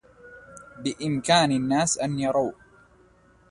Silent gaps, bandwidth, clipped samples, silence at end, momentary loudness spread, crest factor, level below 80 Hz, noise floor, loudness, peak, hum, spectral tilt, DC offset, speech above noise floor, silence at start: none; 11.5 kHz; under 0.1%; 1 s; 23 LU; 20 dB; -58 dBFS; -57 dBFS; -24 LUFS; -8 dBFS; none; -4 dB/octave; under 0.1%; 34 dB; 0.25 s